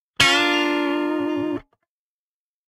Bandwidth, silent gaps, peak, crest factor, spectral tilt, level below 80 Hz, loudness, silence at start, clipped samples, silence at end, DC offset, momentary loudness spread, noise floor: 16 kHz; none; 0 dBFS; 22 dB; -2.5 dB/octave; -54 dBFS; -20 LUFS; 0.2 s; under 0.1%; 1.05 s; under 0.1%; 12 LU; under -90 dBFS